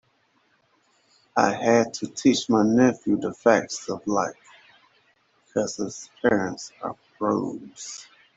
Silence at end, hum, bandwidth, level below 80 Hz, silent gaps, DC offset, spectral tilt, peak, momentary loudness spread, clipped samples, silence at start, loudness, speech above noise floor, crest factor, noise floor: 0.35 s; none; 8.2 kHz; -64 dBFS; none; under 0.1%; -4.5 dB/octave; -2 dBFS; 15 LU; under 0.1%; 1.35 s; -24 LUFS; 43 dB; 22 dB; -66 dBFS